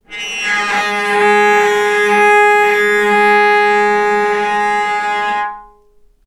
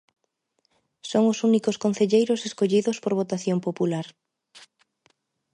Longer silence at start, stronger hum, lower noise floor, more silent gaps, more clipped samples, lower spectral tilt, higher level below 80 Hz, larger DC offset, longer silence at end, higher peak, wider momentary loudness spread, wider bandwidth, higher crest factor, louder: second, 0.1 s vs 1.05 s; neither; second, -48 dBFS vs -73 dBFS; neither; neither; second, -2.5 dB/octave vs -6 dB/octave; first, -54 dBFS vs -74 dBFS; neither; second, 0.65 s vs 1.45 s; first, 0 dBFS vs -8 dBFS; about the same, 7 LU vs 6 LU; first, 14.5 kHz vs 11 kHz; second, 12 dB vs 18 dB; first, -12 LUFS vs -24 LUFS